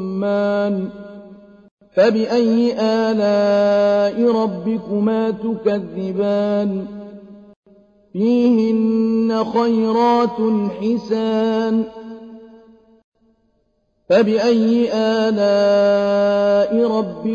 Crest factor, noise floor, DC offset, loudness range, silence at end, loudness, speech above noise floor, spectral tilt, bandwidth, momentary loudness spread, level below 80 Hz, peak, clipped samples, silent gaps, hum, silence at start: 14 dB; -64 dBFS; under 0.1%; 6 LU; 0 s; -17 LUFS; 48 dB; -7 dB/octave; 7.2 kHz; 9 LU; -58 dBFS; -4 dBFS; under 0.1%; 1.71-1.77 s, 7.56-7.63 s, 13.04-13.12 s; none; 0 s